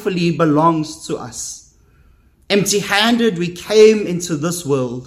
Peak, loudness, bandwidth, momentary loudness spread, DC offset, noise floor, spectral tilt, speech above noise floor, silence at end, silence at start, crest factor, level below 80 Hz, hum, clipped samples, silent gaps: 0 dBFS; -16 LUFS; 15.5 kHz; 15 LU; under 0.1%; -51 dBFS; -4.5 dB/octave; 35 dB; 0 s; 0 s; 16 dB; -52 dBFS; none; under 0.1%; none